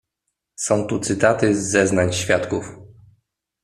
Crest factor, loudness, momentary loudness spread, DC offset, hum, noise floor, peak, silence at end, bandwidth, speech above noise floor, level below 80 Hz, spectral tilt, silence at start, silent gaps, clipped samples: 20 dB; -20 LUFS; 10 LU; under 0.1%; none; -78 dBFS; -2 dBFS; 0.75 s; 14 kHz; 59 dB; -54 dBFS; -4.5 dB/octave; 0.6 s; none; under 0.1%